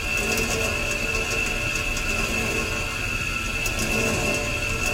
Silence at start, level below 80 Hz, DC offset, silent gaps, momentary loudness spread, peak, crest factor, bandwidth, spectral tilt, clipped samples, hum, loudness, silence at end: 0 s; -34 dBFS; under 0.1%; none; 3 LU; -10 dBFS; 14 dB; 17 kHz; -3 dB/octave; under 0.1%; none; -23 LUFS; 0 s